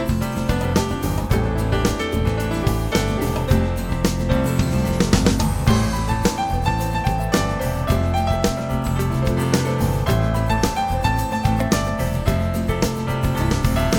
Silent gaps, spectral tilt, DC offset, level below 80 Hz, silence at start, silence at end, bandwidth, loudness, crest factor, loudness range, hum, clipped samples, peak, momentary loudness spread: none; -6 dB/octave; under 0.1%; -26 dBFS; 0 s; 0 s; 18 kHz; -21 LUFS; 18 dB; 1 LU; none; under 0.1%; -2 dBFS; 3 LU